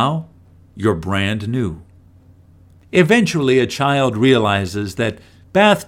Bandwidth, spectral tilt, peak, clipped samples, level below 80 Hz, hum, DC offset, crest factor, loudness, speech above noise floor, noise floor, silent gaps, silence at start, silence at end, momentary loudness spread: 16.5 kHz; -5.5 dB/octave; 0 dBFS; under 0.1%; -48 dBFS; none; under 0.1%; 18 dB; -17 LUFS; 31 dB; -47 dBFS; none; 0 s; 0.05 s; 9 LU